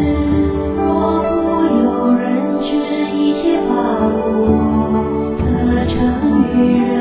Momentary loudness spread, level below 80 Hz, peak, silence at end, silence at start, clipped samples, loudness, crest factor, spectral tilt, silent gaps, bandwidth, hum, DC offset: 4 LU; -28 dBFS; -2 dBFS; 0 s; 0 s; under 0.1%; -15 LUFS; 12 dB; -12 dB/octave; none; 4 kHz; none; under 0.1%